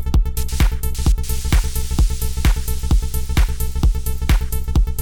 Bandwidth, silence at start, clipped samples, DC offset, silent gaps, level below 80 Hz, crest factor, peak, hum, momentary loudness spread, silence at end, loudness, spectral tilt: 19 kHz; 0 s; under 0.1%; 0.7%; none; -18 dBFS; 12 dB; -4 dBFS; none; 2 LU; 0 s; -21 LUFS; -5 dB/octave